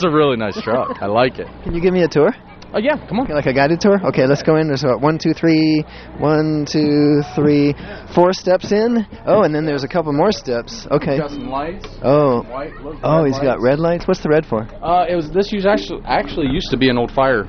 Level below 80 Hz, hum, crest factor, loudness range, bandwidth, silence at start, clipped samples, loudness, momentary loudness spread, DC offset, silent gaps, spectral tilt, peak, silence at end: -38 dBFS; none; 16 dB; 3 LU; 6.6 kHz; 0 s; under 0.1%; -17 LUFS; 9 LU; under 0.1%; none; -7 dB/octave; 0 dBFS; 0 s